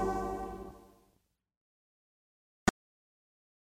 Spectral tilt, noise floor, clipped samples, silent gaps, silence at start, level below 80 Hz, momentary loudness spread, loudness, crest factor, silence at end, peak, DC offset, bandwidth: -4.5 dB/octave; -76 dBFS; under 0.1%; 1.57-2.66 s; 0 s; -54 dBFS; 16 LU; -37 LUFS; 28 dB; 1.1 s; -12 dBFS; under 0.1%; 16 kHz